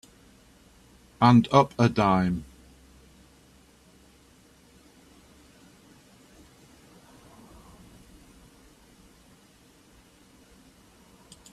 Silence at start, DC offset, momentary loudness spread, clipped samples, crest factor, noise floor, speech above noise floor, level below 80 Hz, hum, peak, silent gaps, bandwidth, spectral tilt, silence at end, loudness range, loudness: 1.2 s; under 0.1%; 14 LU; under 0.1%; 24 dB; -57 dBFS; 37 dB; -58 dBFS; none; -6 dBFS; none; 13 kHz; -7 dB/octave; 9.1 s; 9 LU; -22 LUFS